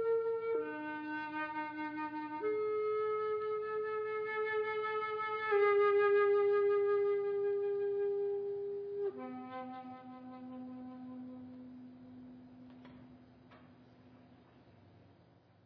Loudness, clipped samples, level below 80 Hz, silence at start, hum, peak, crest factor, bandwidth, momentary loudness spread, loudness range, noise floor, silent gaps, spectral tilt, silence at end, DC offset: -35 LUFS; under 0.1%; -80 dBFS; 0 s; none; -22 dBFS; 14 dB; 5.2 kHz; 22 LU; 20 LU; -65 dBFS; none; -3 dB/octave; 0.65 s; under 0.1%